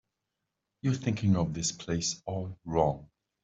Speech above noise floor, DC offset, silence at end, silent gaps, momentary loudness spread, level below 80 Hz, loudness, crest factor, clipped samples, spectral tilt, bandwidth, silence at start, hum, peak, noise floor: 55 dB; under 0.1%; 0.4 s; none; 9 LU; -56 dBFS; -31 LUFS; 20 dB; under 0.1%; -5 dB/octave; 8.2 kHz; 0.85 s; none; -12 dBFS; -85 dBFS